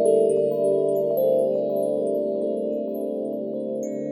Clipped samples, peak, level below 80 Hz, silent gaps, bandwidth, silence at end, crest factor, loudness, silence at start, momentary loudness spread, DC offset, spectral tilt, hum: under 0.1%; -8 dBFS; -76 dBFS; none; 16 kHz; 0 s; 14 dB; -24 LUFS; 0 s; 8 LU; under 0.1%; -8 dB/octave; none